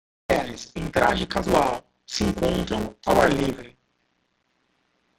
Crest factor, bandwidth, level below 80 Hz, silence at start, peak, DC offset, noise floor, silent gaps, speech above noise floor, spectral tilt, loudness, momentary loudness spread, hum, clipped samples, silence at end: 22 dB; 16.5 kHz; -42 dBFS; 0.3 s; -4 dBFS; under 0.1%; -71 dBFS; none; 48 dB; -5 dB/octave; -24 LUFS; 13 LU; none; under 0.1%; 1.5 s